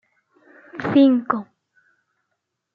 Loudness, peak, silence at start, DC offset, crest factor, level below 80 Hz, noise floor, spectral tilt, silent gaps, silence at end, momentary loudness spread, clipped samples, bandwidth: -19 LUFS; -6 dBFS; 0.75 s; under 0.1%; 18 dB; -72 dBFS; -77 dBFS; -8.5 dB/octave; none; 1.3 s; 15 LU; under 0.1%; 4.8 kHz